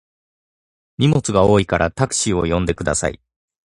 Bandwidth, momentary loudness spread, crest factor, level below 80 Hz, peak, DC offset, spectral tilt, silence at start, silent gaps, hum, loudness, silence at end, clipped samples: 11.5 kHz; 6 LU; 20 dB; -36 dBFS; 0 dBFS; under 0.1%; -5 dB/octave; 1 s; none; none; -18 LUFS; 0.65 s; under 0.1%